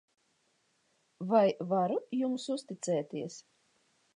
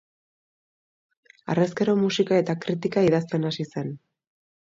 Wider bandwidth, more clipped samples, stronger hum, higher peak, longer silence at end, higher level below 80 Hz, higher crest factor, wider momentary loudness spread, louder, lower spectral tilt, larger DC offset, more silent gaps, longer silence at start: first, 11 kHz vs 7.8 kHz; neither; neither; second, -14 dBFS vs -10 dBFS; about the same, 0.75 s vs 0.8 s; second, -88 dBFS vs -66 dBFS; about the same, 20 dB vs 16 dB; first, 15 LU vs 12 LU; second, -32 LUFS vs -24 LUFS; about the same, -6 dB/octave vs -6.5 dB/octave; neither; neither; second, 1.2 s vs 1.45 s